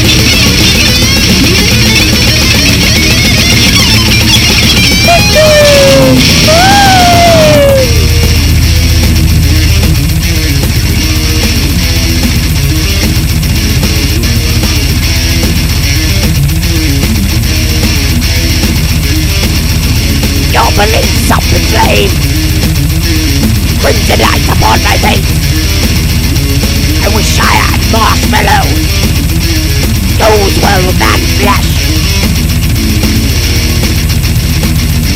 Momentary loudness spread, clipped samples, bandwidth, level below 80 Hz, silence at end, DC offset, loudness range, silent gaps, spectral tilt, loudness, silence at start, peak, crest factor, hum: 6 LU; 1%; 17.5 kHz; -12 dBFS; 0 s; 0.8%; 5 LU; none; -4 dB/octave; -7 LUFS; 0 s; 0 dBFS; 6 dB; none